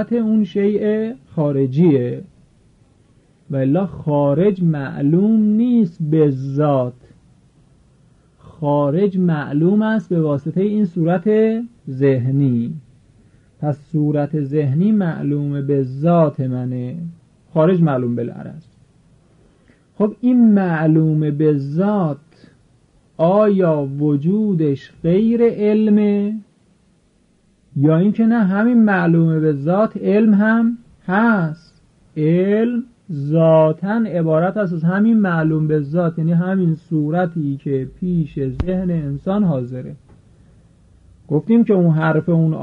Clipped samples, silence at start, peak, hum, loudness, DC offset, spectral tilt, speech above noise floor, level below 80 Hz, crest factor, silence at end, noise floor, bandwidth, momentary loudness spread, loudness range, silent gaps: under 0.1%; 0 s; -4 dBFS; none; -17 LUFS; under 0.1%; -10.5 dB/octave; 41 dB; -48 dBFS; 14 dB; 0 s; -57 dBFS; 4.8 kHz; 10 LU; 4 LU; none